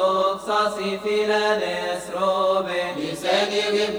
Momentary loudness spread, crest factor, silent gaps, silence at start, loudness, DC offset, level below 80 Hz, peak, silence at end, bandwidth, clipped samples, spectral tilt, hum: 6 LU; 14 dB; none; 0 s; -22 LUFS; under 0.1%; -60 dBFS; -8 dBFS; 0 s; over 20 kHz; under 0.1%; -3.5 dB/octave; none